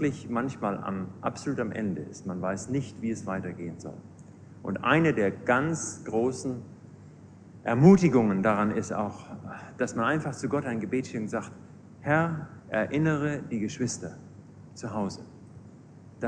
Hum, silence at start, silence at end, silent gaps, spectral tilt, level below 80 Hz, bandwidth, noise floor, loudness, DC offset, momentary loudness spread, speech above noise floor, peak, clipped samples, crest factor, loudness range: none; 0 s; 0 s; none; -6.5 dB/octave; -60 dBFS; 10 kHz; -50 dBFS; -28 LUFS; under 0.1%; 19 LU; 22 dB; -4 dBFS; under 0.1%; 24 dB; 8 LU